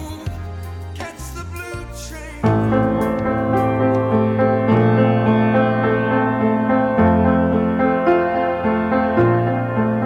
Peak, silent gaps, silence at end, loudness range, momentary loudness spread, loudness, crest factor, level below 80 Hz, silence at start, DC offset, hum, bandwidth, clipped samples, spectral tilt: -4 dBFS; none; 0 s; 5 LU; 15 LU; -17 LUFS; 14 dB; -38 dBFS; 0 s; under 0.1%; none; 14 kHz; under 0.1%; -8 dB/octave